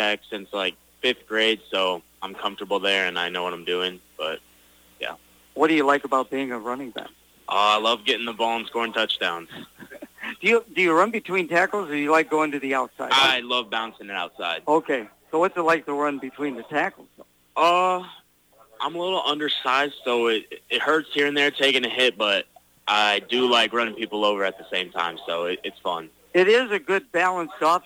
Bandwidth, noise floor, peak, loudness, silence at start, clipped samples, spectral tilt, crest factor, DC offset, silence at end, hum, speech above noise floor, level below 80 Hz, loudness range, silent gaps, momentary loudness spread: 19.5 kHz; -57 dBFS; -8 dBFS; -23 LUFS; 0 s; under 0.1%; -3 dB/octave; 16 dB; under 0.1%; 0.05 s; none; 34 dB; -68 dBFS; 5 LU; none; 12 LU